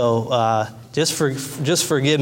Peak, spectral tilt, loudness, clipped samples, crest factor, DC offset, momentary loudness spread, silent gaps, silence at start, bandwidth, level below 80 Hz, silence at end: -6 dBFS; -4 dB/octave; -20 LUFS; under 0.1%; 14 dB; under 0.1%; 6 LU; none; 0 s; 16.5 kHz; -58 dBFS; 0 s